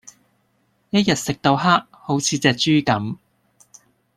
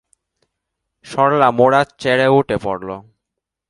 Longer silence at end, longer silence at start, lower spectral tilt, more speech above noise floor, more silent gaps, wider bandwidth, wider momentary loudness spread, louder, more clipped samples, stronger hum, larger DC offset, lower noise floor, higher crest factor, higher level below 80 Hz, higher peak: first, 1.05 s vs 0.7 s; second, 0.05 s vs 1.05 s; second, -4.5 dB/octave vs -6 dB/octave; second, 46 dB vs 66 dB; neither; first, 15.5 kHz vs 11.5 kHz; second, 8 LU vs 14 LU; second, -19 LUFS vs -15 LUFS; neither; neither; neither; second, -65 dBFS vs -81 dBFS; about the same, 20 dB vs 18 dB; about the same, -56 dBFS vs -52 dBFS; about the same, -2 dBFS vs 0 dBFS